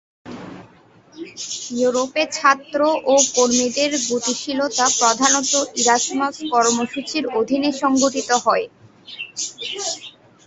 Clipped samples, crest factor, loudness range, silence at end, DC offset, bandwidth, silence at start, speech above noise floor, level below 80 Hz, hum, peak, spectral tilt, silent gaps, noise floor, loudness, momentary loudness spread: under 0.1%; 20 dB; 4 LU; 0.35 s; under 0.1%; 8.4 kHz; 0.25 s; 31 dB; -64 dBFS; none; 0 dBFS; -1 dB/octave; none; -50 dBFS; -18 LUFS; 18 LU